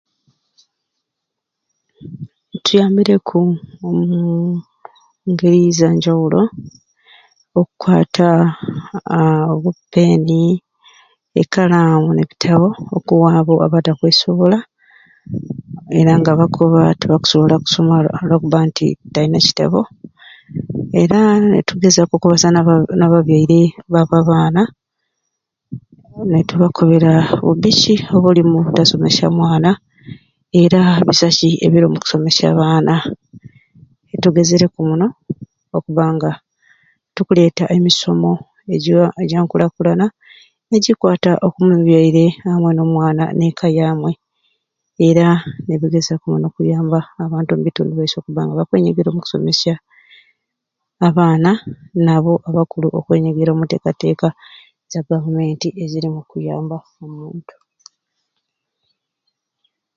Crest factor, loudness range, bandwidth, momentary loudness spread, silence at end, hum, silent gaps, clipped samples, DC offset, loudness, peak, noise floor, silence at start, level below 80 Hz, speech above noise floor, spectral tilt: 14 dB; 6 LU; 7.6 kHz; 13 LU; 2.55 s; none; none; under 0.1%; under 0.1%; -14 LUFS; 0 dBFS; -79 dBFS; 2 s; -52 dBFS; 66 dB; -6 dB/octave